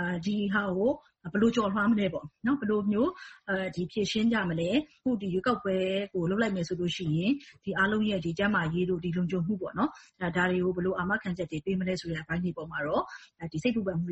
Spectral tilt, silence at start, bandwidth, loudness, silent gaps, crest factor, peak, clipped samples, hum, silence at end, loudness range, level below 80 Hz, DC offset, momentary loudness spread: -6.5 dB/octave; 0 s; 8.2 kHz; -30 LUFS; none; 16 dB; -14 dBFS; under 0.1%; none; 0 s; 2 LU; -58 dBFS; under 0.1%; 7 LU